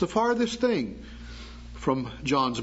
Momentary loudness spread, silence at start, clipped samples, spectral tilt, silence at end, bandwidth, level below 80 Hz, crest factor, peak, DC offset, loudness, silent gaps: 18 LU; 0 s; under 0.1%; -5.5 dB/octave; 0 s; 8 kHz; -46 dBFS; 16 dB; -10 dBFS; under 0.1%; -27 LUFS; none